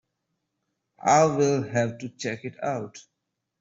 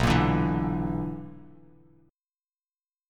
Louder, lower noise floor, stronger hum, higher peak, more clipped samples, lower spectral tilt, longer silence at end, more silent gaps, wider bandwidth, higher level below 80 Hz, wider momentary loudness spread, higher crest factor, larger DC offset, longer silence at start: about the same, -25 LUFS vs -27 LUFS; second, -80 dBFS vs under -90 dBFS; neither; about the same, -8 dBFS vs -8 dBFS; neither; second, -5 dB/octave vs -7 dB/octave; second, 0.6 s vs 1.65 s; neither; second, 8 kHz vs 14.5 kHz; second, -68 dBFS vs -40 dBFS; second, 13 LU vs 17 LU; about the same, 20 dB vs 22 dB; neither; first, 1.05 s vs 0 s